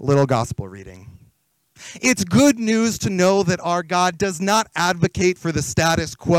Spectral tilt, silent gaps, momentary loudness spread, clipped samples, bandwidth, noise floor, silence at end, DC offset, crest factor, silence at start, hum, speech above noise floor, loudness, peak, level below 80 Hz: -4.5 dB/octave; none; 7 LU; under 0.1%; 17 kHz; -62 dBFS; 0 s; under 0.1%; 14 dB; 0 s; none; 43 dB; -19 LUFS; -6 dBFS; -48 dBFS